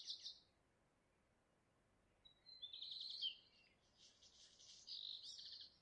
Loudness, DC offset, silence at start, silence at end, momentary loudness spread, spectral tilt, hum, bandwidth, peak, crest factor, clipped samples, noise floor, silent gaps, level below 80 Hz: -51 LUFS; under 0.1%; 0 s; 0 s; 20 LU; 0.5 dB/octave; none; 9.4 kHz; -36 dBFS; 22 dB; under 0.1%; -81 dBFS; none; -88 dBFS